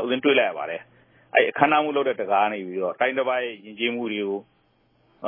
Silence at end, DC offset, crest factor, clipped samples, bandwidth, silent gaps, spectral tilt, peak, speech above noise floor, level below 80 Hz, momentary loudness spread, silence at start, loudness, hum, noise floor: 0 s; under 0.1%; 24 dB; under 0.1%; 3.7 kHz; none; -8.5 dB/octave; -2 dBFS; 41 dB; -80 dBFS; 12 LU; 0 s; -23 LUFS; none; -64 dBFS